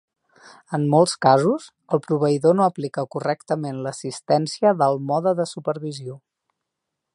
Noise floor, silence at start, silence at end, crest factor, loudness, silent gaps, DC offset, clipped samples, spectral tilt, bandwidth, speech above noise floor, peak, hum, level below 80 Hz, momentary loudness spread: -81 dBFS; 0.45 s; 0.95 s; 20 dB; -21 LUFS; none; under 0.1%; under 0.1%; -6 dB/octave; 11 kHz; 61 dB; -2 dBFS; none; -70 dBFS; 12 LU